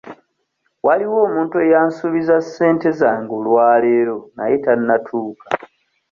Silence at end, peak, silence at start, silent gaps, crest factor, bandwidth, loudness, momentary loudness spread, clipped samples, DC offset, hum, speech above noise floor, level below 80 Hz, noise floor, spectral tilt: 0.45 s; -2 dBFS; 0.05 s; none; 14 dB; 7.2 kHz; -17 LUFS; 11 LU; under 0.1%; under 0.1%; none; 53 dB; -62 dBFS; -69 dBFS; -7.5 dB/octave